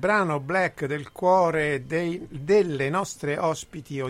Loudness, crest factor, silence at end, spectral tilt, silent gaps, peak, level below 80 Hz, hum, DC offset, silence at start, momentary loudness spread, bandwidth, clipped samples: -25 LUFS; 16 dB; 0 s; -5.5 dB/octave; none; -8 dBFS; -56 dBFS; none; under 0.1%; 0 s; 10 LU; 15.5 kHz; under 0.1%